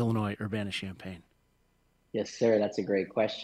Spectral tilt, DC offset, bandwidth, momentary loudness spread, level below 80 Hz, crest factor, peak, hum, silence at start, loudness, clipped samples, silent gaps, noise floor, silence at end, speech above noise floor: -6 dB/octave; under 0.1%; 14 kHz; 16 LU; -66 dBFS; 18 dB; -14 dBFS; none; 0 s; -31 LUFS; under 0.1%; none; -70 dBFS; 0 s; 40 dB